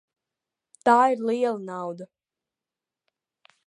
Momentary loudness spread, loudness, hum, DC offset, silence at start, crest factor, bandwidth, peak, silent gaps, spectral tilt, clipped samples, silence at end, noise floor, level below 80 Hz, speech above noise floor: 16 LU; -23 LUFS; none; under 0.1%; 0.85 s; 22 dB; 11 kHz; -4 dBFS; none; -5.5 dB/octave; under 0.1%; 1.6 s; -90 dBFS; -84 dBFS; 67 dB